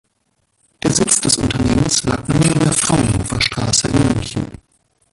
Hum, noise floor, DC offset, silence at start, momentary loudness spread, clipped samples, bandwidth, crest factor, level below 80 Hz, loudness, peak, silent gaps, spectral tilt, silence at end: none; -65 dBFS; under 0.1%; 0.85 s; 7 LU; under 0.1%; 12 kHz; 18 dB; -34 dBFS; -15 LUFS; 0 dBFS; none; -4 dB/octave; 0.55 s